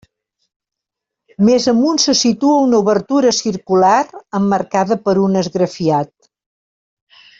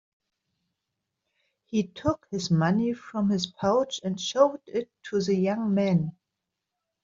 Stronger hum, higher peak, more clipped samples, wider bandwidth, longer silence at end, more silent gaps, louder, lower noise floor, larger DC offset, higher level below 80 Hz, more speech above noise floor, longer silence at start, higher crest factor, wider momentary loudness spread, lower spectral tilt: neither; first, -2 dBFS vs -6 dBFS; neither; about the same, 7.8 kHz vs 7.6 kHz; first, 1.35 s vs 0.95 s; neither; first, -14 LUFS vs -27 LUFS; about the same, -82 dBFS vs -85 dBFS; neither; about the same, -56 dBFS vs -60 dBFS; first, 68 dB vs 59 dB; second, 1.4 s vs 1.7 s; second, 14 dB vs 20 dB; about the same, 6 LU vs 8 LU; second, -4.5 dB/octave vs -6 dB/octave